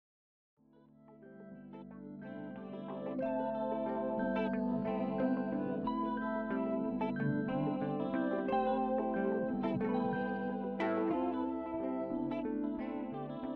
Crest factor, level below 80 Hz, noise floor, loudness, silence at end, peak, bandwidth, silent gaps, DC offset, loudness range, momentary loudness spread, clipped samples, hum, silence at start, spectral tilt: 14 dB; -64 dBFS; -63 dBFS; -36 LUFS; 0 s; -22 dBFS; 4.9 kHz; none; under 0.1%; 6 LU; 12 LU; under 0.1%; none; 1 s; -6.5 dB/octave